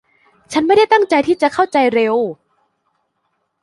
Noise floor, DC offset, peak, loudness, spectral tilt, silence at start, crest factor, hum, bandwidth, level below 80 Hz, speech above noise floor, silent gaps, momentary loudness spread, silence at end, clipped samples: -69 dBFS; under 0.1%; -2 dBFS; -14 LUFS; -4.5 dB/octave; 0.5 s; 16 dB; none; 11.5 kHz; -58 dBFS; 55 dB; none; 8 LU; 1.3 s; under 0.1%